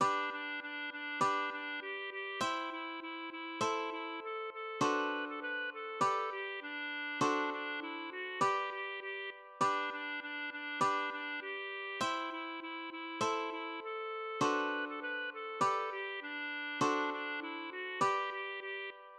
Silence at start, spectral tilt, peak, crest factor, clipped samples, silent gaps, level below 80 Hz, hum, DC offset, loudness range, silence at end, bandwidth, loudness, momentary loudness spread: 0 s; -3 dB/octave; -20 dBFS; 18 dB; under 0.1%; none; -86 dBFS; none; under 0.1%; 2 LU; 0 s; 13 kHz; -37 LUFS; 8 LU